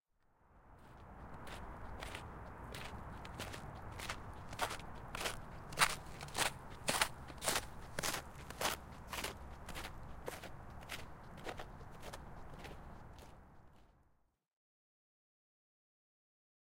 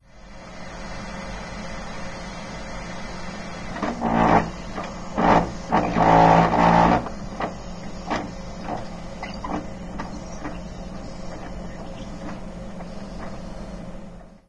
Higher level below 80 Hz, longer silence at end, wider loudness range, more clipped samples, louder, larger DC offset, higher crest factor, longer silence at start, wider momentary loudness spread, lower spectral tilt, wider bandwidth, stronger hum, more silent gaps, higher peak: second, -56 dBFS vs -38 dBFS; first, 2.55 s vs 0.1 s; about the same, 17 LU vs 16 LU; neither; second, -43 LUFS vs -23 LUFS; neither; first, 32 dB vs 22 dB; first, 0.45 s vs 0.15 s; second, 17 LU vs 20 LU; second, -2 dB/octave vs -6.5 dB/octave; first, 16.5 kHz vs 10.5 kHz; neither; neither; second, -12 dBFS vs -4 dBFS